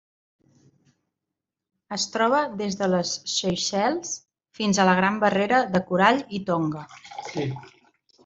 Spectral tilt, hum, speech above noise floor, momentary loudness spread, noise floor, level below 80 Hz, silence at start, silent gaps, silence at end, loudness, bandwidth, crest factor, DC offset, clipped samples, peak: -4 dB/octave; none; 62 dB; 14 LU; -86 dBFS; -64 dBFS; 1.9 s; none; 0.55 s; -23 LUFS; 8 kHz; 22 dB; under 0.1%; under 0.1%; -4 dBFS